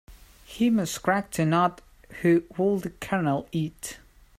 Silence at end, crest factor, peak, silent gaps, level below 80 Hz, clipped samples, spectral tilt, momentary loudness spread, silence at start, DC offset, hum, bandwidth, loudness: 0.4 s; 18 dB; -8 dBFS; none; -54 dBFS; under 0.1%; -6 dB/octave; 15 LU; 0.1 s; under 0.1%; none; 16 kHz; -26 LUFS